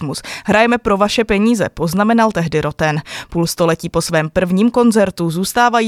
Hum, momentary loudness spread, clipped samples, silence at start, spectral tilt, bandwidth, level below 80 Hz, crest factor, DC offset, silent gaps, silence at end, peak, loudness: none; 7 LU; under 0.1%; 0 s; -5 dB/octave; 15 kHz; -40 dBFS; 14 dB; under 0.1%; none; 0 s; 0 dBFS; -15 LUFS